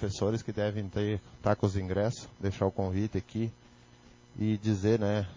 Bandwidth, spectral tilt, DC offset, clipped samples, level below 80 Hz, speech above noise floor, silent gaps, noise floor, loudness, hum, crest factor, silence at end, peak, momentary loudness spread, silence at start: 7.6 kHz; -7 dB/octave; under 0.1%; under 0.1%; -48 dBFS; 26 dB; none; -57 dBFS; -32 LUFS; none; 18 dB; 0 s; -14 dBFS; 8 LU; 0 s